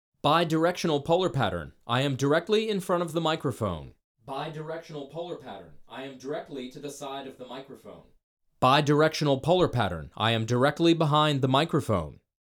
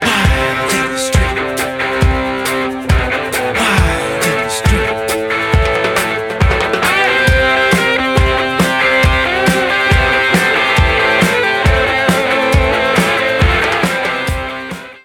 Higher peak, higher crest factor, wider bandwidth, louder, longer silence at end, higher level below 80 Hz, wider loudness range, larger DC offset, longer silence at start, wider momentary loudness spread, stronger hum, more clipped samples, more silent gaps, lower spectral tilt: second, -8 dBFS vs 0 dBFS; first, 20 dB vs 14 dB; about the same, 18.5 kHz vs 19 kHz; second, -26 LUFS vs -13 LUFS; first, 0.35 s vs 0.05 s; second, -56 dBFS vs -22 dBFS; first, 14 LU vs 3 LU; neither; first, 0.25 s vs 0 s; first, 18 LU vs 6 LU; neither; neither; first, 4.04-4.15 s, 8.23-8.37 s vs none; first, -6 dB/octave vs -4.5 dB/octave